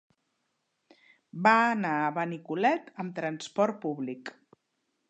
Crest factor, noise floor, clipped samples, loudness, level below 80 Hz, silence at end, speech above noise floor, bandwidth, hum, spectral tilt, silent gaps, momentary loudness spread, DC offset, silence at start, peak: 22 dB; -79 dBFS; under 0.1%; -28 LUFS; -82 dBFS; 0.8 s; 51 dB; 9 kHz; none; -5.5 dB/octave; none; 15 LU; under 0.1%; 1.35 s; -8 dBFS